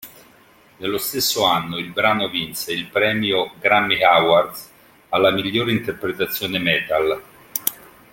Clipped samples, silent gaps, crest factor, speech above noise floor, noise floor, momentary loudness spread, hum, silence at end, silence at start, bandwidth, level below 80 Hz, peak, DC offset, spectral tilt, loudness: under 0.1%; none; 20 dB; 32 dB; -51 dBFS; 11 LU; none; 0.35 s; 0 s; 17 kHz; -56 dBFS; 0 dBFS; under 0.1%; -3.5 dB/octave; -19 LUFS